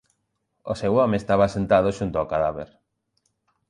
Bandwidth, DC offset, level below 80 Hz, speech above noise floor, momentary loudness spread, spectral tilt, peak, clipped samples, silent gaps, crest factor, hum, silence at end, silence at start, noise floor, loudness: 11 kHz; under 0.1%; -48 dBFS; 53 dB; 16 LU; -7 dB/octave; -6 dBFS; under 0.1%; none; 18 dB; none; 1.05 s; 0.65 s; -75 dBFS; -22 LUFS